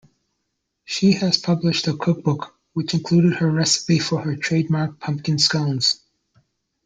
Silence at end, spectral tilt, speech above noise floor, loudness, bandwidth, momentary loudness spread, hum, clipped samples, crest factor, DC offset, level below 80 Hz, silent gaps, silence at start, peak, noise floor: 0.9 s; -4.5 dB/octave; 56 dB; -20 LUFS; 9.4 kHz; 9 LU; none; under 0.1%; 18 dB; under 0.1%; -58 dBFS; none; 0.9 s; -2 dBFS; -76 dBFS